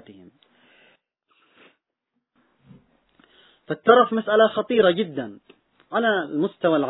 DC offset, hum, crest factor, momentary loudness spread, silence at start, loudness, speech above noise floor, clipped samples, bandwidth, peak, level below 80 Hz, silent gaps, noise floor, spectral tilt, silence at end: under 0.1%; none; 24 dB; 14 LU; 3.7 s; -21 LUFS; 59 dB; under 0.1%; 4.1 kHz; 0 dBFS; -70 dBFS; none; -79 dBFS; -9 dB/octave; 0 s